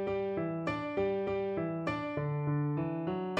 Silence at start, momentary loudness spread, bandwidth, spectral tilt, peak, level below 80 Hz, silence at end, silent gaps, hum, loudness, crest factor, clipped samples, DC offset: 0 s; 3 LU; 7.8 kHz; -8.5 dB/octave; -20 dBFS; -62 dBFS; 0 s; none; none; -34 LUFS; 14 dB; under 0.1%; under 0.1%